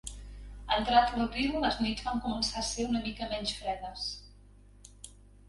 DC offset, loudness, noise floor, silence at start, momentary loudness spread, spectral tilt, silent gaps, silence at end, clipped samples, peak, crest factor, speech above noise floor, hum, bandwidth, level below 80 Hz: under 0.1%; -31 LUFS; -56 dBFS; 0.05 s; 23 LU; -3.5 dB/octave; none; 0.25 s; under 0.1%; -12 dBFS; 22 dB; 25 dB; 50 Hz at -45 dBFS; 11.5 kHz; -48 dBFS